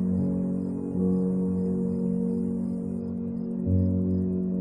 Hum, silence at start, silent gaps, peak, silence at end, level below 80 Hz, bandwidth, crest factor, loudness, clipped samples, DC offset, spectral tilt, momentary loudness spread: none; 0 s; none; -14 dBFS; 0 s; -50 dBFS; 2 kHz; 12 dB; -28 LUFS; under 0.1%; under 0.1%; -12.5 dB/octave; 6 LU